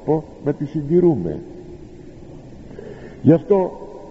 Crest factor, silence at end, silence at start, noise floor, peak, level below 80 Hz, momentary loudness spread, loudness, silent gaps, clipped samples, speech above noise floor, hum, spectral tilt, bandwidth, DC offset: 18 dB; 0 s; 0 s; -38 dBFS; -2 dBFS; -46 dBFS; 24 LU; -19 LUFS; none; under 0.1%; 21 dB; none; -10.5 dB/octave; 7.6 kHz; under 0.1%